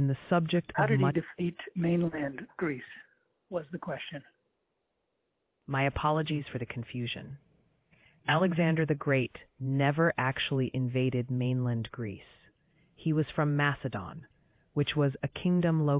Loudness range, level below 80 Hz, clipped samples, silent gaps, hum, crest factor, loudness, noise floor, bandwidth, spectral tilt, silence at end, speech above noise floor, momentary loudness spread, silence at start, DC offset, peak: 6 LU; -60 dBFS; under 0.1%; none; none; 20 dB; -31 LUFS; -80 dBFS; 4 kHz; -5.5 dB/octave; 0 s; 50 dB; 13 LU; 0 s; under 0.1%; -12 dBFS